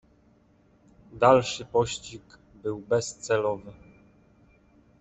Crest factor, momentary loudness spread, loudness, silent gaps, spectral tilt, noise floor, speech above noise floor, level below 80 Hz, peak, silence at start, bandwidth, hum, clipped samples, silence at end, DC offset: 24 dB; 19 LU; -26 LUFS; none; -4.5 dB/octave; -61 dBFS; 36 dB; -60 dBFS; -4 dBFS; 1.15 s; 8.4 kHz; none; under 0.1%; 1.3 s; under 0.1%